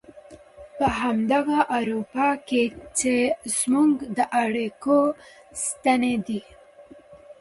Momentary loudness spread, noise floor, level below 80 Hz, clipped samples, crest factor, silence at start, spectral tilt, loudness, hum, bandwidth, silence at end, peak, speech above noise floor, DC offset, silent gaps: 8 LU; -49 dBFS; -54 dBFS; under 0.1%; 18 dB; 0.15 s; -4 dB/octave; -23 LUFS; none; 11.5 kHz; 0.1 s; -6 dBFS; 26 dB; under 0.1%; none